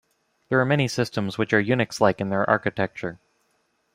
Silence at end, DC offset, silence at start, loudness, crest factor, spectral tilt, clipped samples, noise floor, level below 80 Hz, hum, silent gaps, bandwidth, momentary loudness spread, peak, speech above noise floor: 0.8 s; under 0.1%; 0.5 s; -23 LUFS; 22 dB; -6 dB/octave; under 0.1%; -69 dBFS; -60 dBFS; none; none; 16 kHz; 7 LU; -2 dBFS; 47 dB